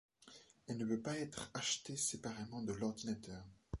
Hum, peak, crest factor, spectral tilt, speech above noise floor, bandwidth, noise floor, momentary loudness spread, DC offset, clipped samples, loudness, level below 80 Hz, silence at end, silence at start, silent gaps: none; -26 dBFS; 18 dB; -3.5 dB/octave; 21 dB; 11.5 kHz; -64 dBFS; 17 LU; under 0.1%; under 0.1%; -42 LUFS; -62 dBFS; 0 s; 0.2 s; none